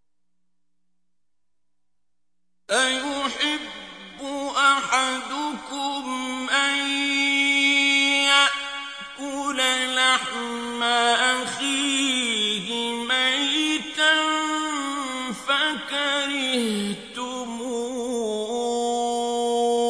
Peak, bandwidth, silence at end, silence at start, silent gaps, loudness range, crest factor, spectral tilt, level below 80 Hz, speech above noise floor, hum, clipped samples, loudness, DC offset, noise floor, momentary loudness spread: -4 dBFS; 11 kHz; 0 s; 2.7 s; none; 7 LU; 20 dB; -1 dB/octave; -64 dBFS; 59 dB; 60 Hz at -65 dBFS; under 0.1%; -22 LUFS; under 0.1%; -85 dBFS; 12 LU